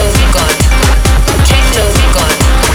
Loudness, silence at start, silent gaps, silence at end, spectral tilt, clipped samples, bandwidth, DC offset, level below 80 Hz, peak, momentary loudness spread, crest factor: -9 LUFS; 0 s; none; 0 s; -4 dB/octave; under 0.1%; 17.5 kHz; under 0.1%; -10 dBFS; 0 dBFS; 1 LU; 8 dB